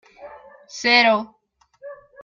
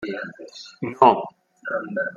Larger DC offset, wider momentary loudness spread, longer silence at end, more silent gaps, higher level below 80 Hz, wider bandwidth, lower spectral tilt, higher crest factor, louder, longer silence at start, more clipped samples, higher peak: neither; first, 26 LU vs 21 LU; first, 0.3 s vs 0 s; neither; about the same, -66 dBFS vs -66 dBFS; about the same, 7.4 kHz vs 7.4 kHz; second, -2.5 dB/octave vs -6 dB/octave; about the same, 20 dB vs 22 dB; first, -17 LUFS vs -22 LUFS; first, 0.2 s vs 0 s; neither; about the same, -2 dBFS vs -2 dBFS